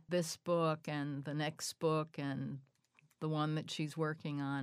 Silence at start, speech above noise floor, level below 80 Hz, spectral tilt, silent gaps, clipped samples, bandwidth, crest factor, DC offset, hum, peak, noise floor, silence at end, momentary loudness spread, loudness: 0.1 s; 35 dB; -82 dBFS; -5.5 dB/octave; none; under 0.1%; 15.5 kHz; 16 dB; under 0.1%; none; -22 dBFS; -72 dBFS; 0 s; 6 LU; -39 LUFS